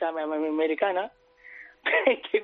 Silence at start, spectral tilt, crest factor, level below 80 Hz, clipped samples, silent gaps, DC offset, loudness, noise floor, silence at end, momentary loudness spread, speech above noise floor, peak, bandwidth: 0 s; 0 dB/octave; 20 dB; -74 dBFS; under 0.1%; none; under 0.1%; -26 LUFS; -49 dBFS; 0 s; 22 LU; 23 dB; -8 dBFS; 4.3 kHz